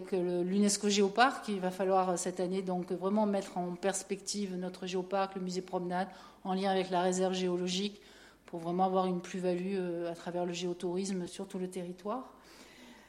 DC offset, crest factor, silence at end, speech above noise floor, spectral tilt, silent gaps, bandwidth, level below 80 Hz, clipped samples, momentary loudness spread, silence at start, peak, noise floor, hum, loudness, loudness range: under 0.1%; 20 dB; 0.05 s; 22 dB; -4.5 dB/octave; none; 14.5 kHz; -72 dBFS; under 0.1%; 11 LU; 0 s; -12 dBFS; -55 dBFS; none; -34 LUFS; 5 LU